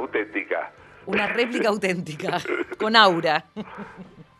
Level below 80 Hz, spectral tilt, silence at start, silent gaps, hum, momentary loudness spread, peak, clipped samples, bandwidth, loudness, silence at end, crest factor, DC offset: -64 dBFS; -4.5 dB/octave; 0 s; none; none; 22 LU; 0 dBFS; under 0.1%; 13 kHz; -22 LUFS; 0.15 s; 24 dB; under 0.1%